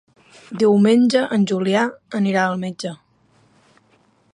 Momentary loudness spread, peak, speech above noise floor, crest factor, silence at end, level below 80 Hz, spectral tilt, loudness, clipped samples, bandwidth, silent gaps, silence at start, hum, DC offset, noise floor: 15 LU; -4 dBFS; 41 dB; 16 dB; 1.4 s; -68 dBFS; -6 dB/octave; -18 LUFS; under 0.1%; 11 kHz; none; 0.5 s; none; under 0.1%; -58 dBFS